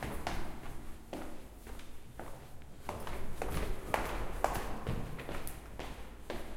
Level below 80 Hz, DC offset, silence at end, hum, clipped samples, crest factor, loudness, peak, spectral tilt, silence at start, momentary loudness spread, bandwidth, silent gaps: -44 dBFS; under 0.1%; 0 s; none; under 0.1%; 26 dB; -42 LUFS; -12 dBFS; -5 dB/octave; 0 s; 14 LU; 16.5 kHz; none